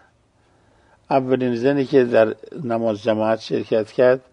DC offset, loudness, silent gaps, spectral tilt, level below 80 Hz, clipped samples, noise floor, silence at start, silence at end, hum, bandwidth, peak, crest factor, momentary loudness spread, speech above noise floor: under 0.1%; -20 LUFS; none; -7.5 dB/octave; -62 dBFS; under 0.1%; -59 dBFS; 1.1 s; 0.15 s; none; 9.4 kHz; -2 dBFS; 18 dB; 6 LU; 40 dB